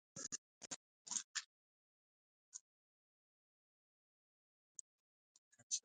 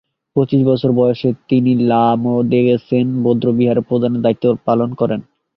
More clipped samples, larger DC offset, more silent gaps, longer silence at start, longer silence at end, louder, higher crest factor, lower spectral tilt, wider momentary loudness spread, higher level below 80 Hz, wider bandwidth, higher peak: neither; neither; first, 0.38-0.61 s, 0.67-1.05 s, 1.24-1.34 s, 1.46-2.52 s, 2.61-5.51 s, 5.63-5.70 s vs none; second, 0.15 s vs 0.35 s; second, 0.05 s vs 0.35 s; second, -49 LUFS vs -15 LUFS; first, 28 dB vs 14 dB; second, 1 dB/octave vs -11 dB/octave; first, 15 LU vs 5 LU; second, under -90 dBFS vs -54 dBFS; first, 9.4 kHz vs 5.6 kHz; second, -26 dBFS vs -2 dBFS